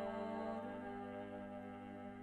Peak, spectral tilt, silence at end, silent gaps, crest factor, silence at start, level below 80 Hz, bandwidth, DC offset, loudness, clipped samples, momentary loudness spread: -32 dBFS; -7.5 dB/octave; 0 s; none; 14 dB; 0 s; -72 dBFS; 11 kHz; under 0.1%; -48 LUFS; under 0.1%; 7 LU